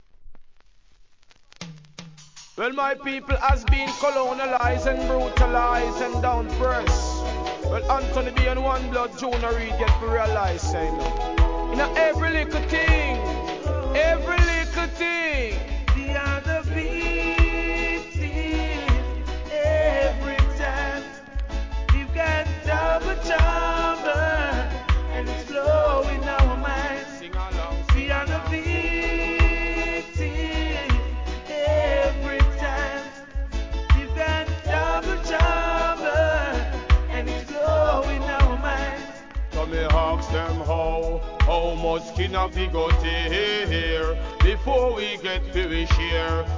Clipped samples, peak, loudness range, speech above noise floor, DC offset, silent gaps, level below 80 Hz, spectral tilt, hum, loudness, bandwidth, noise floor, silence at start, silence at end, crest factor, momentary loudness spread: under 0.1%; -6 dBFS; 2 LU; 33 dB; 0.2%; none; -26 dBFS; -5.5 dB/octave; none; -24 LUFS; 7.6 kHz; -55 dBFS; 0.2 s; 0 s; 18 dB; 8 LU